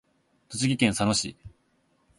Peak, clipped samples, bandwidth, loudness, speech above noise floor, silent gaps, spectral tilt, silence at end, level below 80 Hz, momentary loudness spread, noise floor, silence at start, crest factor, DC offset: -8 dBFS; under 0.1%; 12 kHz; -26 LUFS; 43 dB; none; -4 dB/octave; 0.7 s; -54 dBFS; 13 LU; -68 dBFS; 0.5 s; 22 dB; under 0.1%